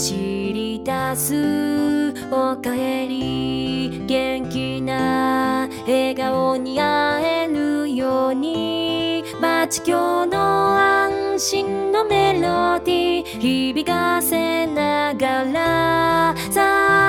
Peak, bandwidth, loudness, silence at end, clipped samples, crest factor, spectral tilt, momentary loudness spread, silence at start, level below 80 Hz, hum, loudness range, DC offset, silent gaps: -4 dBFS; 17 kHz; -20 LUFS; 0 s; under 0.1%; 14 dB; -4 dB/octave; 6 LU; 0 s; -48 dBFS; none; 4 LU; under 0.1%; none